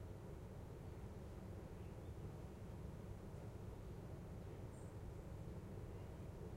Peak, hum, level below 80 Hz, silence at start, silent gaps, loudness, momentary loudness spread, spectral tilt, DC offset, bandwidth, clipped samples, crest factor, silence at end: -40 dBFS; none; -60 dBFS; 0 s; none; -54 LUFS; 1 LU; -7.5 dB/octave; under 0.1%; 16 kHz; under 0.1%; 12 dB; 0 s